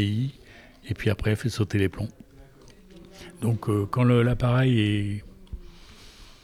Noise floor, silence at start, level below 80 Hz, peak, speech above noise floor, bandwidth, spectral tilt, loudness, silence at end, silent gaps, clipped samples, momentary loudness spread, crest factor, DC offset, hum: -50 dBFS; 0 s; -44 dBFS; -10 dBFS; 27 dB; 13 kHz; -7 dB/octave; -25 LUFS; 0.2 s; none; under 0.1%; 23 LU; 16 dB; under 0.1%; none